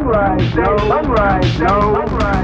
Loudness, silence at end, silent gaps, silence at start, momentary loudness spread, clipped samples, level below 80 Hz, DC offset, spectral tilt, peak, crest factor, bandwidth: -14 LUFS; 0 s; none; 0 s; 2 LU; under 0.1%; -24 dBFS; under 0.1%; -7.5 dB/octave; -2 dBFS; 12 dB; 8 kHz